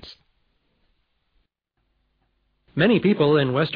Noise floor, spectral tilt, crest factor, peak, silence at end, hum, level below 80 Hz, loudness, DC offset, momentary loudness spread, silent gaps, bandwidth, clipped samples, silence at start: -74 dBFS; -9.5 dB/octave; 18 dB; -8 dBFS; 0 s; none; -60 dBFS; -19 LUFS; under 0.1%; 5 LU; none; 5.2 kHz; under 0.1%; 0 s